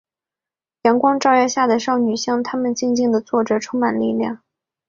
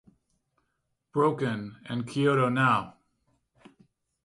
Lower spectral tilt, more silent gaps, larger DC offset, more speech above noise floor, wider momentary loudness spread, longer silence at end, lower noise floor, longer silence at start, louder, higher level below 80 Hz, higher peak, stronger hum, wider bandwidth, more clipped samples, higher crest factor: second, -4 dB/octave vs -7 dB/octave; neither; neither; first, 72 dB vs 52 dB; second, 6 LU vs 12 LU; second, 0.5 s vs 1.35 s; first, -90 dBFS vs -79 dBFS; second, 0.85 s vs 1.15 s; first, -18 LUFS vs -27 LUFS; first, -62 dBFS vs -68 dBFS; first, -2 dBFS vs -10 dBFS; neither; second, 7.6 kHz vs 11.5 kHz; neither; about the same, 18 dB vs 20 dB